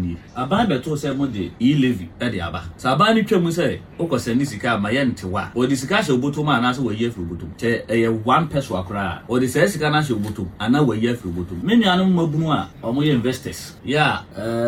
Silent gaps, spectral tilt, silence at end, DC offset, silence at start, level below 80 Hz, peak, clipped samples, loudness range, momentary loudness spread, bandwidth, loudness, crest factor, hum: none; -6 dB/octave; 0 s; under 0.1%; 0 s; -46 dBFS; -4 dBFS; under 0.1%; 1 LU; 9 LU; 16.5 kHz; -20 LUFS; 16 dB; none